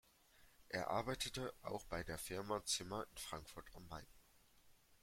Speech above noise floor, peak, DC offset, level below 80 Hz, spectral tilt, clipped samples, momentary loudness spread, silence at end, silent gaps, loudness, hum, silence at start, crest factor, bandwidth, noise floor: 24 dB; -26 dBFS; under 0.1%; -64 dBFS; -3 dB/octave; under 0.1%; 14 LU; 0.05 s; none; -45 LUFS; none; 0.35 s; 22 dB; 16.5 kHz; -70 dBFS